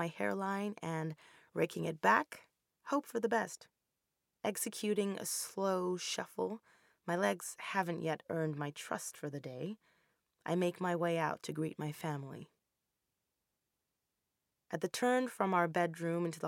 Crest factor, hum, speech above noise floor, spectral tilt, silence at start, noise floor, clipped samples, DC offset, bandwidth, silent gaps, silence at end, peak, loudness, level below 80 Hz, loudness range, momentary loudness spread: 24 dB; none; 51 dB; -4.5 dB/octave; 0 s; -87 dBFS; under 0.1%; under 0.1%; 17 kHz; none; 0 s; -14 dBFS; -37 LUFS; -84 dBFS; 5 LU; 12 LU